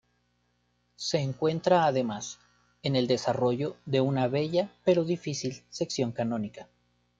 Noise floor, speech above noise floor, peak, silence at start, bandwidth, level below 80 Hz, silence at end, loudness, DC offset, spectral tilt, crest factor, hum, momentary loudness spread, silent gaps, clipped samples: -72 dBFS; 45 dB; -10 dBFS; 1 s; 9 kHz; -66 dBFS; 0.55 s; -28 LUFS; under 0.1%; -5.5 dB/octave; 20 dB; 60 Hz at -50 dBFS; 11 LU; none; under 0.1%